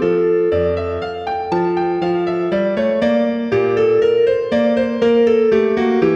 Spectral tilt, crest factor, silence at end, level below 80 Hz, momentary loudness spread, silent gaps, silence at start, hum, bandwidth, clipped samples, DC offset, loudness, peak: -7.5 dB/octave; 14 dB; 0 s; -46 dBFS; 6 LU; none; 0 s; none; 7 kHz; under 0.1%; under 0.1%; -16 LUFS; -2 dBFS